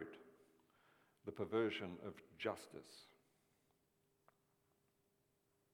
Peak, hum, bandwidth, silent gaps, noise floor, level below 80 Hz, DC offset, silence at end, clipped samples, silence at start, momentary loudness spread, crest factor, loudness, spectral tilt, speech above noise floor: -26 dBFS; none; 18.5 kHz; none; -82 dBFS; -86 dBFS; under 0.1%; 2.7 s; under 0.1%; 0 s; 20 LU; 24 dB; -46 LUFS; -5.5 dB/octave; 37 dB